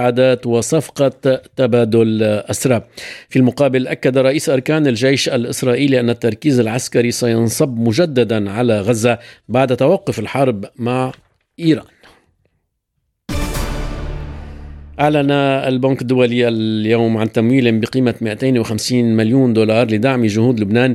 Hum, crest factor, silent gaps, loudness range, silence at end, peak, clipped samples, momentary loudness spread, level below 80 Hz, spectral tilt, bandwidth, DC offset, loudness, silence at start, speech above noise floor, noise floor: none; 14 dB; none; 7 LU; 0 s; 0 dBFS; under 0.1%; 9 LU; -36 dBFS; -6 dB/octave; 15.5 kHz; under 0.1%; -15 LUFS; 0 s; 56 dB; -71 dBFS